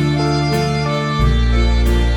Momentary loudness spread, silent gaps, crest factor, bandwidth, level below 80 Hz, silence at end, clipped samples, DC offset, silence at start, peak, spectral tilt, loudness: 2 LU; none; 12 dB; 14.5 kHz; -18 dBFS; 0 s; under 0.1%; under 0.1%; 0 s; -2 dBFS; -6.5 dB/octave; -16 LUFS